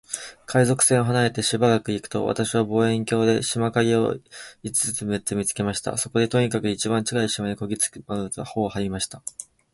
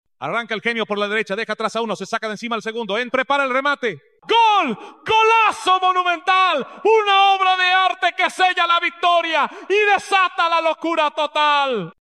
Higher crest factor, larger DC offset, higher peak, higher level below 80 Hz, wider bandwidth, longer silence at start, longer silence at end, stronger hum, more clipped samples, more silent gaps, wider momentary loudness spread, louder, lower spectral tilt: first, 20 dB vs 14 dB; neither; about the same, -4 dBFS vs -4 dBFS; first, -54 dBFS vs -66 dBFS; about the same, 12 kHz vs 12.5 kHz; about the same, 0.1 s vs 0.2 s; first, 0.3 s vs 0.1 s; neither; neither; neither; about the same, 10 LU vs 10 LU; second, -23 LUFS vs -18 LUFS; first, -4.5 dB/octave vs -3 dB/octave